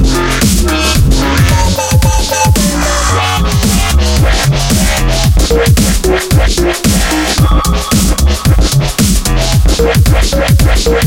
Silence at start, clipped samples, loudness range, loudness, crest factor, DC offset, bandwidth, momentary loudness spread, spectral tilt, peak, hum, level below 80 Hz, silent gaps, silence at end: 0 s; under 0.1%; 0 LU; -10 LUFS; 8 dB; under 0.1%; 17 kHz; 2 LU; -4.5 dB/octave; 0 dBFS; none; -12 dBFS; none; 0 s